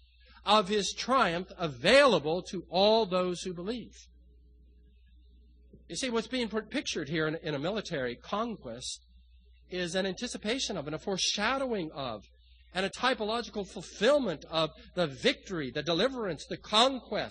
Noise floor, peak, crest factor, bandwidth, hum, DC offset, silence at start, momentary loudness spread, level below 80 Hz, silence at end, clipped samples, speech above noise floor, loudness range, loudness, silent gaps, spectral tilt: -58 dBFS; -10 dBFS; 22 dB; 10 kHz; none; under 0.1%; 0.45 s; 13 LU; -58 dBFS; 0 s; under 0.1%; 28 dB; 8 LU; -30 LUFS; none; -3.5 dB/octave